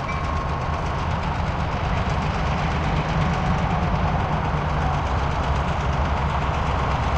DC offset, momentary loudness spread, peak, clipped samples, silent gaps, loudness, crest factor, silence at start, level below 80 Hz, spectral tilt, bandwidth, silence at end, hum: under 0.1%; 3 LU; -10 dBFS; under 0.1%; none; -23 LUFS; 14 dB; 0 s; -28 dBFS; -6.5 dB/octave; 8.6 kHz; 0 s; none